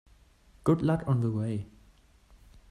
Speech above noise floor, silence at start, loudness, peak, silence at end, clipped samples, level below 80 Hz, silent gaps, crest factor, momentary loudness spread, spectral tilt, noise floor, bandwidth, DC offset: 32 dB; 0.65 s; -29 LUFS; -10 dBFS; 1.05 s; under 0.1%; -56 dBFS; none; 20 dB; 10 LU; -9 dB/octave; -60 dBFS; 11.5 kHz; under 0.1%